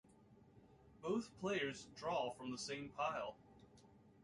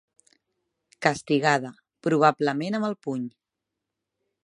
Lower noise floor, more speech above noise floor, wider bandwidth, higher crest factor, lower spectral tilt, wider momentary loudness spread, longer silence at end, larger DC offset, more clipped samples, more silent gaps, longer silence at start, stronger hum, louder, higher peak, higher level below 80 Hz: second, -67 dBFS vs -85 dBFS; second, 23 dB vs 61 dB; about the same, 11.5 kHz vs 11.5 kHz; second, 18 dB vs 24 dB; second, -4 dB/octave vs -5.5 dB/octave; about the same, 12 LU vs 12 LU; second, 0.1 s vs 1.15 s; neither; neither; neither; second, 0.1 s vs 1 s; neither; second, -44 LUFS vs -25 LUFS; second, -28 dBFS vs -4 dBFS; about the same, -76 dBFS vs -72 dBFS